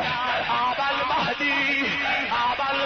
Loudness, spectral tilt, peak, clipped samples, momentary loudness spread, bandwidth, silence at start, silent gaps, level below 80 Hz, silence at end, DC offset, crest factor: -23 LUFS; -3.5 dB/octave; -14 dBFS; under 0.1%; 2 LU; 6.6 kHz; 0 s; none; -54 dBFS; 0 s; under 0.1%; 10 dB